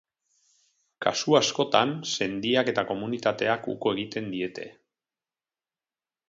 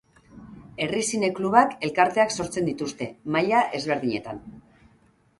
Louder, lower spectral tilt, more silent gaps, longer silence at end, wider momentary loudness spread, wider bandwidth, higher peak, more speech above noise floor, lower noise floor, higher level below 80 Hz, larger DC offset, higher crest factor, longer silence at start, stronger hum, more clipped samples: about the same, -26 LUFS vs -24 LUFS; about the same, -3.5 dB/octave vs -4 dB/octave; neither; first, 1.6 s vs 0.8 s; about the same, 10 LU vs 12 LU; second, 7.8 kHz vs 11.5 kHz; about the same, -4 dBFS vs -2 dBFS; first, over 64 dB vs 37 dB; first, under -90 dBFS vs -60 dBFS; second, -68 dBFS vs -60 dBFS; neither; about the same, 24 dB vs 22 dB; first, 1 s vs 0.35 s; neither; neither